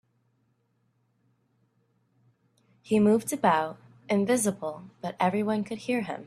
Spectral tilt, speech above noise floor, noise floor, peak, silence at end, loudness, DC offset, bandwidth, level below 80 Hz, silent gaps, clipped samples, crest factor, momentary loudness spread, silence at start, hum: -5 dB/octave; 46 dB; -72 dBFS; -8 dBFS; 0 s; -27 LUFS; under 0.1%; 14 kHz; -70 dBFS; none; under 0.1%; 20 dB; 13 LU; 2.85 s; none